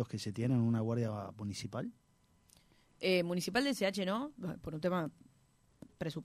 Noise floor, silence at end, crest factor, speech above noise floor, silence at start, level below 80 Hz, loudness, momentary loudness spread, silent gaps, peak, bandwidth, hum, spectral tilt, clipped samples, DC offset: -70 dBFS; 0 s; 18 dB; 34 dB; 0 s; -68 dBFS; -36 LUFS; 11 LU; none; -18 dBFS; 15.5 kHz; none; -6 dB/octave; under 0.1%; under 0.1%